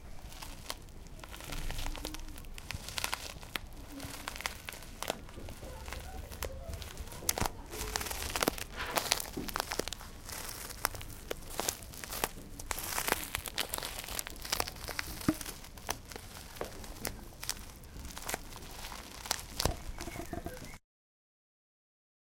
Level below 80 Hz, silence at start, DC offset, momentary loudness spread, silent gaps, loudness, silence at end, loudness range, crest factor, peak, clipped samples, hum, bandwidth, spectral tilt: -48 dBFS; 0 s; under 0.1%; 13 LU; none; -38 LUFS; 1.45 s; 7 LU; 38 dB; -2 dBFS; under 0.1%; none; 17 kHz; -2.5 dB/octave